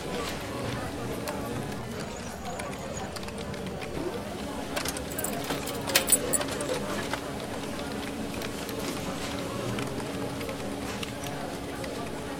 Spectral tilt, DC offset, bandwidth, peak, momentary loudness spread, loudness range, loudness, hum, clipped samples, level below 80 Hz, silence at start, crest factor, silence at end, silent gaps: -3.5 dB/octave; 0.2%; 17 kHz; -2 dBFS; 8 LU; 7 LU; -32 LUFS; none; under 0.1%; -50 dBFS; 0 s; 30 dB; 0 s; none